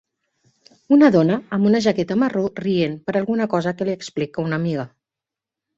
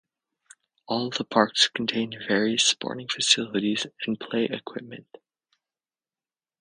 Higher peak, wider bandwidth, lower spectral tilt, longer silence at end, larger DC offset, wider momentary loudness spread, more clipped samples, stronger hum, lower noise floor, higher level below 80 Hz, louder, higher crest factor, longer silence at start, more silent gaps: about the same, -2 dBFS vs -2 dBFS; second, 8 kHz vs 10 kHz; first, -7 dB/octave vs -2.5 dB/octave; second, 0.9 s vs 1.6 s; neither; about the same, 11 LU vs 13 LU; neither; neither; about the same, -87 dBFS vs under -90 dBFS; first, -60 dBFS vs -70 dBFS; first, -20 LUFS vs -24 LUFS; second, 18 dB vs 26 dB; about the same, 0.9 s vs 0.9 s; neither